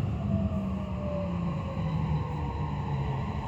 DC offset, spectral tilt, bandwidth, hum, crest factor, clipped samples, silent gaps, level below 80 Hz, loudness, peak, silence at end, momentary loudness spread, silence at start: under 0.1%; -9 dB/octave; 7.8 kHz; none; 14 dB; under 0.1%; none; -42 dBFS; -32 LUFS; -16 dBFS; 0 s; 3 LU; 0 s